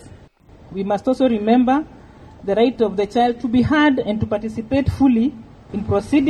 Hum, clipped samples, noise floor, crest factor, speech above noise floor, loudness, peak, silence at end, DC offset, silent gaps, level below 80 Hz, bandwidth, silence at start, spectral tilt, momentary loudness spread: none; under 0.1%; -46 dBFS; 16 dB; 28 dB; -18 LUFS; -4 dBFS; 0 s; under 0.1%; none; -42 dBFS; 9.4 kHz; 0.05 s; -7.5 dB/octave; 12 LU